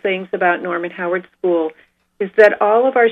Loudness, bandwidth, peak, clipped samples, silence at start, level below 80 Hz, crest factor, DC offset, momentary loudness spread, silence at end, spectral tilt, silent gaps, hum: -16 LUFS; 7 kHz; 0 dBFS; under 0.1%; 0.05 s; -68 dBFS; 16 dB; under 0.1%; 11 LU; 0 s; -6.5 dB/octave; none; none